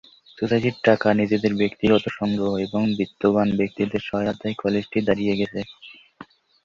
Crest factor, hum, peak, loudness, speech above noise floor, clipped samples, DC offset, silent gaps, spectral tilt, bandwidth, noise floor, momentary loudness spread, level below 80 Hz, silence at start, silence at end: 20 dB; none; -2 dBFS; -22 LUFS; 25 dB; under 0.1%; under 0.1%; none; -7.5 dB/octave; 7.2 kHz; -47 dBFS; 7 LU; -54 dBFS; 0.35 s; 0.4 s